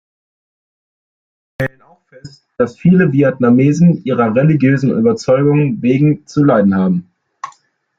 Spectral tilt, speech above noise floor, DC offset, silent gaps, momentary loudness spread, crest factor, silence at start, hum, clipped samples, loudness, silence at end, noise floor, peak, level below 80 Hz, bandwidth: -8.5 dB/octave; 34 dB; under 0.1%; none; 12 LU; 14 dB; 1.6 s; none; under 0.1%; -13 LUFS; 0.5 s; -46 dBFS; 0 dBFS; -52 dBFS; 7.6 kHz